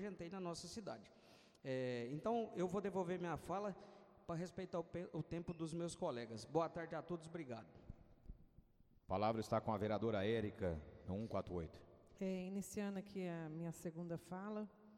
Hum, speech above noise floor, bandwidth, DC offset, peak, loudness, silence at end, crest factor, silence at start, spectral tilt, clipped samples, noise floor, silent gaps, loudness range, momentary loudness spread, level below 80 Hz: none; 24 dB; 16 kHz; under 0.1%; -26 dBFS; -45 LUFS; 0 s; 20 dB; 0 s; -6.5 dB/octave; under 0.1%; -69 dBFS; none; 4 LU; 15 LU; -68 dBFS